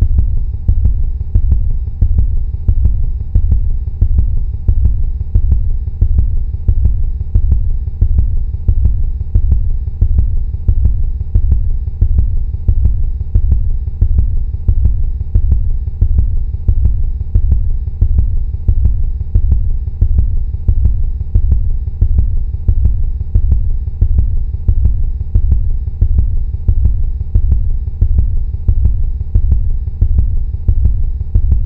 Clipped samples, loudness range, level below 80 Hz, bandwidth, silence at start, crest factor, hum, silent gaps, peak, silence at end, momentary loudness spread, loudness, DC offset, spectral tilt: 0.2%; 1 LU; -12 dBFS; 1.1 kHz; 0 s; 12 dB; none; none; 0 dBFS; 0 s; 4 LU; -17 LUFS; 0.5%; -12.5 dB/octave